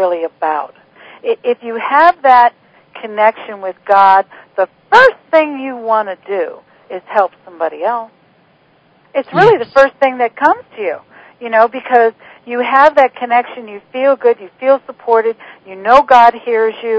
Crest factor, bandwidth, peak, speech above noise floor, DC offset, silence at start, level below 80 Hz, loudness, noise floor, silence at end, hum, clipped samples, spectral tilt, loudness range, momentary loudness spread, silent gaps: 14 dB; 8 kHz; 0 dBFS; 39 dB; under 0.1%; 0 s; -56 dBFS; -12 LUFS; -51 dBFS; 0 s; none; 0.6%; -5.5 dB/octave; 5 LU; 16 LU; none